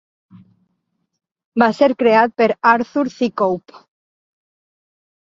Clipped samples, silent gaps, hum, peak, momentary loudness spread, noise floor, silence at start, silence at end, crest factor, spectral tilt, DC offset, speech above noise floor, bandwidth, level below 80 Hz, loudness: under 0.1%; none; none; -2 dBFS; 7 LU; -71 dBFS; 1.55 s; 1.65 s; 18 dB; -6 dB/octave; under 0.1%; 55 dB; 7.6 kHz; -64 dBFS; -16 LUFS